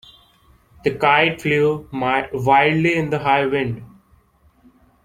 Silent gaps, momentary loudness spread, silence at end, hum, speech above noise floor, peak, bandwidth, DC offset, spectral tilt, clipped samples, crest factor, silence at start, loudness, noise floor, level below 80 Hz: none; 10 LU; 1.15 s; none; 38 dB; -2 dBFS; 15.5 kHz; under 0.1%; -6.5 dB/octave; under 0.1%; 18 dB; 0.85 s; -18 LUFS; -56 dBFS; -52 dBFS